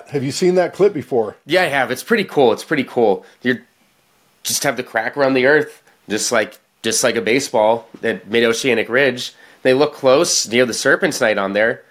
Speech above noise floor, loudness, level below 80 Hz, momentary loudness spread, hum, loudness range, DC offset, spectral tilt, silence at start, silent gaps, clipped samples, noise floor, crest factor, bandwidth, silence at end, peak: 41 dB; -17 LUFS; -60 dBFS; 7 LU; none; 3 LU; under 0.1%; -3 dB/octave; 0.1 s; none; under 0.1%; -58 dBFS; 16 dB; 16 kHz; 0.1 s; 0 dBFS